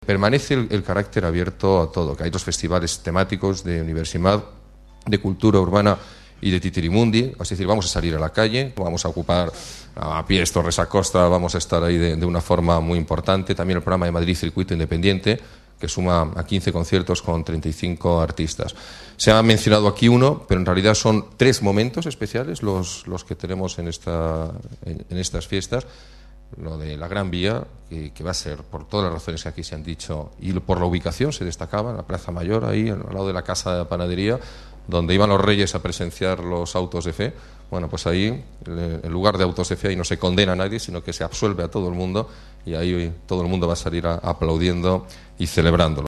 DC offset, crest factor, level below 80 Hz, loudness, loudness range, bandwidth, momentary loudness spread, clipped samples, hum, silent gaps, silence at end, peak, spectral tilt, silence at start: under 0.1%; 22 dB; -36 dBFS; -21 LUFS; 9 LU; 13 kHz; 13 LU; under 0.1%; none; none; 0 s; 0 dBFS; -5.5 dB/octave; 0 s